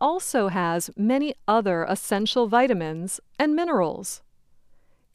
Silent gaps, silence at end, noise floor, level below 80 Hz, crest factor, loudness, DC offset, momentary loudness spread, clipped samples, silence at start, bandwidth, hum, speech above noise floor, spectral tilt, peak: none; 0.95 s; -55 dBFS; -62 dBFS; 18 dB; -24 LUFS; under 0.1%; 10 LU; under 0.1%; 0 s; 15.5 kHz; none; 32 dB; -4.5 dB/octave; -8 dBFS